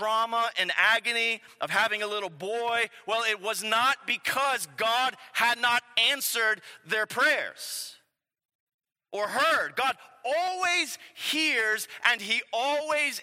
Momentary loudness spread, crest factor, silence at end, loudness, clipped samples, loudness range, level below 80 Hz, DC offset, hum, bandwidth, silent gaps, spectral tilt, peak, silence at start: 10 LU; 22 dB; 0 s; -26 LUFS; under 0.1%; 4 LU; -84 dBFS; under 0.1%; none; 16 kHz; 8.45-8.49 s, 8.55-8.67 s, 8.74-8.79 s; -0.5 dB/octave; -6 dBFS; 0 s